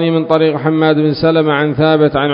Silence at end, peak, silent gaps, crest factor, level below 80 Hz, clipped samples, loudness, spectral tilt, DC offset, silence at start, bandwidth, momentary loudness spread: 0 s; 0 dBFS; none; 12 dB; -44 dBFS; under 0.1%; -12 LUFS; -9.5 dB/octave; under 0.1%; 0 s; 5.4 kHz; 2 LU